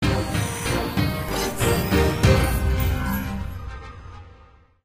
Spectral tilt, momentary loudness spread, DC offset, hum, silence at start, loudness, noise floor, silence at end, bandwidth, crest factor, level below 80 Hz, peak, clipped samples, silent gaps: -5.5 dB/octave; 18 LU; under 0.1%; none; 0 s; -23 LUFS; -51 dBFS; 0.5 s; 15.5 kHz; 18 dB; -30 dBFS; -4 dBFS; under 0.1%; none